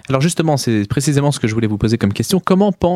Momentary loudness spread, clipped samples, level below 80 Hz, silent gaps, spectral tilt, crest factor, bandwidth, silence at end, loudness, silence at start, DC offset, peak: 3 LU; under 0.1%; -40 dBFS; none; -6 dB/octave; 16 dB; 15.5 kHz; 0 s; -16 LUFS; 0.1 s; under 0.1%; 0 dBFS